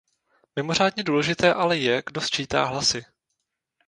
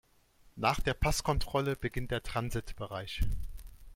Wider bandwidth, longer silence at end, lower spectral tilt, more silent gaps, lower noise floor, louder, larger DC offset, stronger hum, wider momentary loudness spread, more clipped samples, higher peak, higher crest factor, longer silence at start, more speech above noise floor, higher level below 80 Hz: second, 10.5 kHz vs 16.5 kHz; first, 0.85 s vs 0 s; about the same, -3.5 dB/octave vs -4.5 dB/octave; neither; first, -79 dBFS vs -63 dBFS; first, -23 LUFS vs -34 LUFS; neither; neither; second, 7 LU vs 12 LU; neither; first, -2 dBFS vs -12 dBFS; about the same, 22 dB vs 20 dB; about the same, 0.55 s vs 0.55 s; first, 56 dB vs 31 dB; second, -56 dBFS vs -40 dBFS